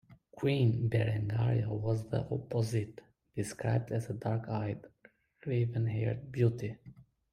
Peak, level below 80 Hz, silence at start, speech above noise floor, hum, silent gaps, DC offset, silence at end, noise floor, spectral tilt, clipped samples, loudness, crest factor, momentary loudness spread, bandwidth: -16 dBFS; -62 dBFS; 0.1 s; 33 dB; none; none; under 0.1%; 0.3 s; -65 dBFS; -7.5 dB/octave; under 0.1%; -34 LUFS; 18 dB; 11 LU; 11 kHz